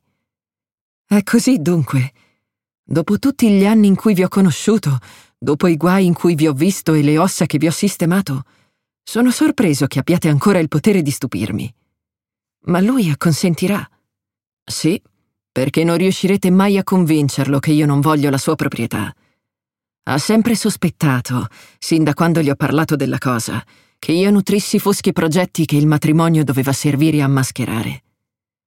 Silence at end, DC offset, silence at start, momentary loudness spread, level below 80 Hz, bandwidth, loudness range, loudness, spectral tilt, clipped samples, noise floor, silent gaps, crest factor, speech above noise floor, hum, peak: 0.7 s; under 0.1%; 1.1 s; 9 LU; -54 dBFS; 17 kHz; 4 LU; -16 LUFS; -6 dB/octave; under 0.1%; under -90 dBFS; 2.79-2.83 s, 14.53-14.66 s; 14 dB; over 75 dB; none; -2 dBFS